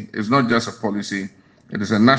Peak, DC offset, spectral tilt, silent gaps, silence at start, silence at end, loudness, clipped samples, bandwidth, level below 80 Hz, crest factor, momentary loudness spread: 0 dBFS; under 0.1%; -5.5 dB/octave; none; 0 s; 0 s; -21 LUFS; under 0.1%; 9.4 kHz; -60 dBFS; 20 dB; 12 LU